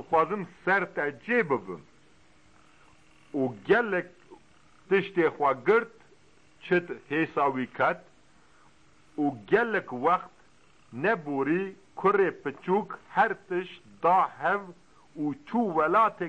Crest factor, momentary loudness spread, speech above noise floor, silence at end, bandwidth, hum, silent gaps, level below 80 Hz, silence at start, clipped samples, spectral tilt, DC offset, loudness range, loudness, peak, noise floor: 18 dB; 13 LU; 34 dB; 0 s; 8.8 kHz; none; none; -68 dBFS; 0 s; under 0.1%; -7.5 dB/octave; 0.1%; 3 LU; -27 LUFS; -12 dBFS; -61 dBFS